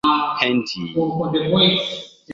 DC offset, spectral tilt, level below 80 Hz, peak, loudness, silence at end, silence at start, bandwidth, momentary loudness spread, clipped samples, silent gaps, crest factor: under 0.1%; -5.5 dB/octave; -56 dBFS; 0 dBFS; -19 LUFS; 0 s; 0.05 s; 7.8 kHz; 10 LU; under 0.1%; none; 18 dB